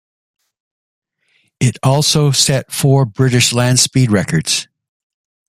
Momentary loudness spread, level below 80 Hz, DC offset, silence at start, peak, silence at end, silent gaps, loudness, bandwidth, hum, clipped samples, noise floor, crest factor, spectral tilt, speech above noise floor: 6 LU; -48 dBFS; under 0.1%; 1.6 s; 0 dBFS; 0.85 s; none; -13 LUFS; 15 kHz; none; under 0.1%; -61 dBFS; 16 dB; -4 dB/octave; 48 dB